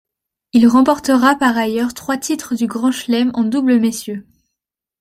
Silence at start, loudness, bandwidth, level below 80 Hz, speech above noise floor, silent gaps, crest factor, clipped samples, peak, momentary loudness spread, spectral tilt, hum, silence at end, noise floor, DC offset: 0.55 s; -15 LUFS; 16 kHz; -54 dBFS; 67 dB; none; 14 dB; under 0.1%; -2 dBFS; 9 LU; -4.5 dB/octave; none; 0.8 s; -81 dBFS; under 0.1%